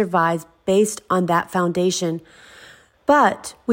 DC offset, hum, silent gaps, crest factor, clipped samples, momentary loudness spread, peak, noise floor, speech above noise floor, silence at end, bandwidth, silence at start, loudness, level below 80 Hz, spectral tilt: under 0.1%; none; none; 16 dB; under 0.1%; 11 LU; -4 dBFS; -47 dBFS; 28 dB; 0 s; 16.5 kHz; 0 s; -20 LUFS; -58 dBFS; -5 dB/octave